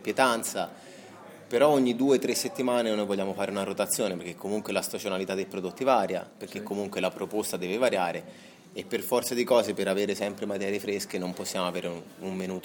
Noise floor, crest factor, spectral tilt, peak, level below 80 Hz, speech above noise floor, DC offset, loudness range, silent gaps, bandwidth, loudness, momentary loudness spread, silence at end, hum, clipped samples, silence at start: -48 dBFS; 24 dB; -4 dB/octave; -6 dBFS; -74 dBFS; 19 dB; under 0.1%; 4 LU; none; 17.5 kHz; -28 LUFS; 13 LU; 0 s; none; under 0.1%; 0 s